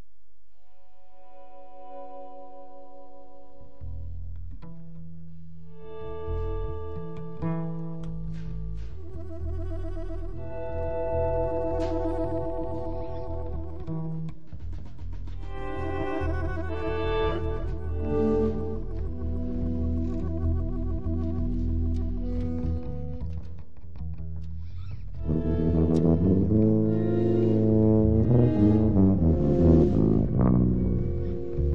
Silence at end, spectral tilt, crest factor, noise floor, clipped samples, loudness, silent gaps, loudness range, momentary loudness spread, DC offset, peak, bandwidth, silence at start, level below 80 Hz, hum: 0 s; -10.5 dB/octave; 20 dB; -65 dBFS; under 0.1%; -27 LUFS; none; 22 LU; 21 LU; 2%; -6 dBFS; 6 kHz; 1.35 s; -36 dBFS; none